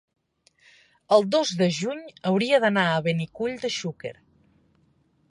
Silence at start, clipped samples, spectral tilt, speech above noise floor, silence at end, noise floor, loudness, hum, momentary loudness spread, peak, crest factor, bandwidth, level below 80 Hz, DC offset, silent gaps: 1.1 s; under 0.1%; -5 dB/octave; 41 dB; 1.2 s; -65 dBFS; -24 LUFS; none; 11 LU; -4 dBFS; 20 dB; 11 kHz; -68 dBFS; under 0.1%; none